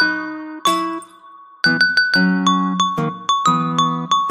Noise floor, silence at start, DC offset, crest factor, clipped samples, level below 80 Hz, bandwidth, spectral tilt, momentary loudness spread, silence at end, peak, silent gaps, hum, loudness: -43 dBFS; 0 s; under 0.1%; 16 dB; under 0.1%; -60 dBFS; 15 kHz; -4 dB/octave; 9 LU; 0 s; -2 dBFS; none; none; -17 LUFS